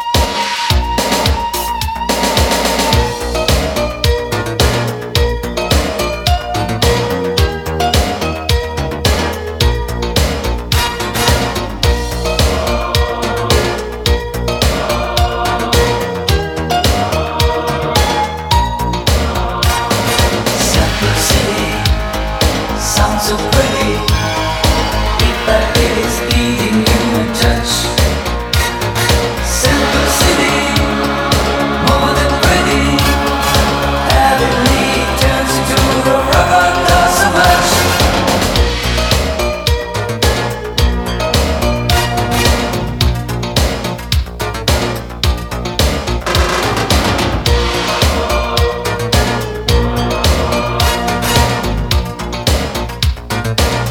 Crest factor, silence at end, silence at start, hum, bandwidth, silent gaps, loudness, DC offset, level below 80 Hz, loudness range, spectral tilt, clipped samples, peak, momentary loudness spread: 14 dB; 0 s; 0 s; none; 19 kHz; none; -13 LUFS; under 0.1%; -20 dBFS; 4 LU; -4 dB/octave; under 0.1%; 0 dBFS; 6 LU